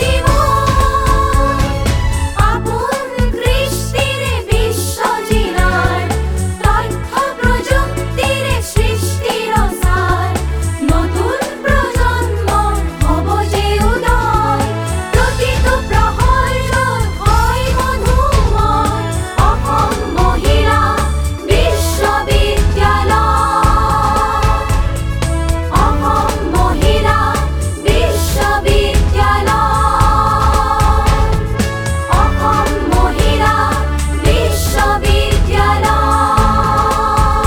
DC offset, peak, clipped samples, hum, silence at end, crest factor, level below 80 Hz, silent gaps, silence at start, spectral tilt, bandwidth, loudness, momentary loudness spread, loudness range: under 0.1%; 0 dBFS; under 0.1%; none; 0 s; 12 dB; -18 dBFS; none; 0 s; -5 dB/octave; 19.5 kHz; -14 LUFS; 5 LU; 3 LU